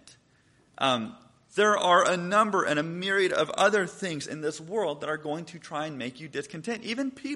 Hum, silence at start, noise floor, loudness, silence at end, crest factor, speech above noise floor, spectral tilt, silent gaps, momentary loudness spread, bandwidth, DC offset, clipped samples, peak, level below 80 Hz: none; 0.05 s; -63 dBFS; -27 LUFS; 0 s; 20 dB; 36 dB; -4 dB/octave; none; 13 LU; 11.5 kHz; under 0.1%; under 0.1%; -8 dBFS; -72 dBFS